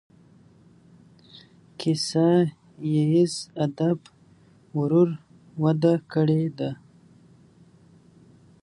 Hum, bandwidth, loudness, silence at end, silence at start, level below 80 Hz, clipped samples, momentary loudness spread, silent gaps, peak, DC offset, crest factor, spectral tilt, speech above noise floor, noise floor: none; 11.5 kHz; -24 LUFS; 1.9 s; 1.8 s; -68 dBFS; under 0.1%; 12 LU; none; -8 dBFS; under 0.1%; 18 dB; -7 dB/octave; 33 dB; -55 dBFS